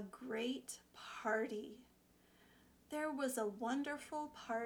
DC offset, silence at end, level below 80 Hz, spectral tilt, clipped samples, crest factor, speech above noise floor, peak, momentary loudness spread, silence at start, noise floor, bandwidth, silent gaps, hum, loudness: under 0.1%; 0 s; -78 dBFS; -3.5 dB/octave; under 0.1%; 18 dB; 28 dB; -26 dBFS; 12 LU; 0 s; -70 dBFS; over 20 kHz; none; 60 Hz at -75 dBFS; -43 LUFS